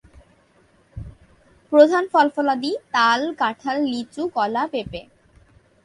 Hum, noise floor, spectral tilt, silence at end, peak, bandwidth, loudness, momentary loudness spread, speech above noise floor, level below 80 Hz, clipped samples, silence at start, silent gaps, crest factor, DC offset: none; -58 dBFS; -4.5 dB/octave; 0.85 s; 0 dBFS; 11 kHz; -20 LUFS; 20 LU; 38 dB; -52 dBFS; under 0.1%; 0.95 s; none; 22 dB; under 0.1%